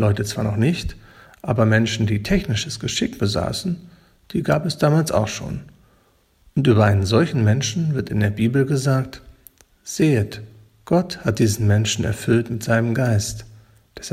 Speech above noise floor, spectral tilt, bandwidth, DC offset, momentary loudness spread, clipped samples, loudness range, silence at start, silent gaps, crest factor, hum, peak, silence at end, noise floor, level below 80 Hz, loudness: 40 dB; -5.5 dB/octave; 15 kHz; under 0.1%; 12 LU; under 0.1%; 3 LU; 0 s; none; 18 dB; none; -2 dBFS; 0 s; -59 dBFS; -42 dBFS; -20 LUFS